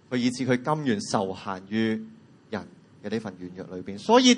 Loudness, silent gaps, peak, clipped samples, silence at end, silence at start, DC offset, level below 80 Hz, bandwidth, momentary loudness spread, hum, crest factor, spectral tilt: -28 LUFS; none; -4 dBFS; under 0.1%; 0 s; 0.1 s; under 0.1%; -70 dBFS; 10.5 kHz; 14 LU; none; 22 dB; -4.5 dB/octave